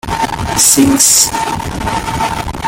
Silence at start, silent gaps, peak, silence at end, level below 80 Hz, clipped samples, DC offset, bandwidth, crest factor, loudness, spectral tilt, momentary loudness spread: 0.05 s; none; 0 dBFS; 0 s; -30 dBFS; 0.1%; under 0.1%; over 20 kHz; 12 dB; -10 LUFS; -2.5 dB/octave; 11 LU